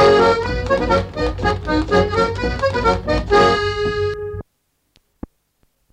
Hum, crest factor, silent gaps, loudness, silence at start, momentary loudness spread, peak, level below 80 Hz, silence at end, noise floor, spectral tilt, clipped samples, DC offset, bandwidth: none; 14 dB; none; -18 LUFS; 0 s; 9 LU; -4 dBFS; -30 dBFS; 1.5 s; -68 dBFS; -6 dB/octave; under 0.1%; under 0.1%; 10.5 kHz